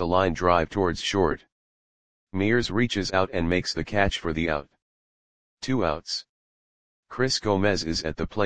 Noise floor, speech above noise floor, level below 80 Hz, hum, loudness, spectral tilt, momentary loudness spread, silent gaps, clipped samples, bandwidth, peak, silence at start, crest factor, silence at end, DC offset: under -90 dBFS; over 65 dB; -44 dBFS; none; -25 LUFS; -5 dB/octave; 9 LU; 1.52-2.27 s, 4.82-5.57 s, 6.29-7.03 s; under 0.1%; 10 kHz; -4 dBFS; 0 s; 22 dB; 0 s; 0.9%